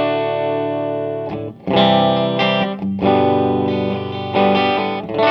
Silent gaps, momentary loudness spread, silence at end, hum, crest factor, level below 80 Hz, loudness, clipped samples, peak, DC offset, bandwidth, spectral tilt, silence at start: none; 9 LU; 0 s; none; 16 dB; -54 dBFS; -17 LUFS; under 0.1%; 0 dBFS; under 0.1%; 6.2 kHz; -8 dB/octave; 0 s